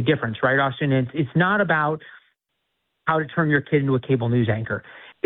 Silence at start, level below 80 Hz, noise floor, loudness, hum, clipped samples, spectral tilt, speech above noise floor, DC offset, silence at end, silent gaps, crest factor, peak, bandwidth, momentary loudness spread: 0 s; -58 dBFS; -77 dBFS; -22 LUFS; none; under 0.1%; -11 dB/octave; 55 dB; under 0.1%; 0.15 s; none; 16 dB; -6 dBFS; 4.1 kHz; 7 LU